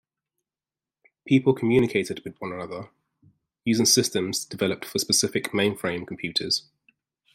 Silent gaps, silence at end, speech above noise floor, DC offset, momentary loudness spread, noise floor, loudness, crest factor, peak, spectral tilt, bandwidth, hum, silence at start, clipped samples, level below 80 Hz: none; 0.75 s; over 66 dB; under 0.1%; 14 LU; under -90 dBFS; -24 LUFS; 20 dB; -6 dBFS; -3.5 dB/octave; 16 kHz; none; 1.25 s; under 0.1%; -62 dBFS